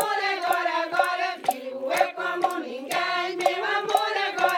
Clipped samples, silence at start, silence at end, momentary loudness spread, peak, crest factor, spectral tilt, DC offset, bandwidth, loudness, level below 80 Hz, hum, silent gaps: under 0.1%; 0 s; 0 s; 5 LU; -6 dBFS; 20 dB; -1.5 dB/octave; under 0.1%; 19.5 kHz; -25 LUFS; -86 dBFS; none; none